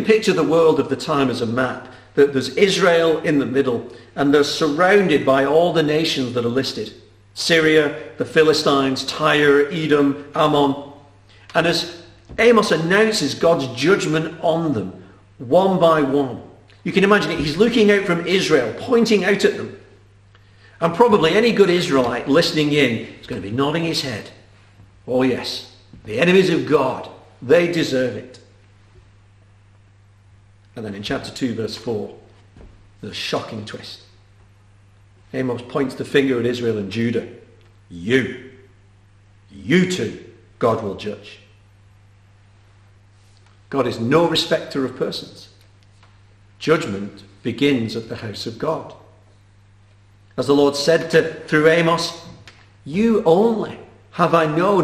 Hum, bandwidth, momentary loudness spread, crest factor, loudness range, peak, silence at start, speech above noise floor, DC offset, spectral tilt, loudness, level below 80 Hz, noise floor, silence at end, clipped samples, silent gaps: 50 Hz at -50 dBFS; 14 kHz; 16 LU; 18 dB; 11 LU; 0 dBFS; 0 s; 33 dB; under 0.1%; -5 dB/octave; -18 LUFS; -52 dBFS; -50 dBFS; 0 s; under 0.1%; none